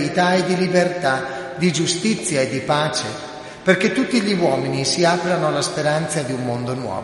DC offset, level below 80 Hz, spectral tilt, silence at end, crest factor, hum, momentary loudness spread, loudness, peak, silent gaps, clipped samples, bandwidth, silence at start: under 0.1%; -56 dBFS; -4.5 dB/octave; 0 s; 18 dB; none; 7 LU; -19 LUFS; 0 dBFS; none; under 0.1%; 11.5 kHz; 0 s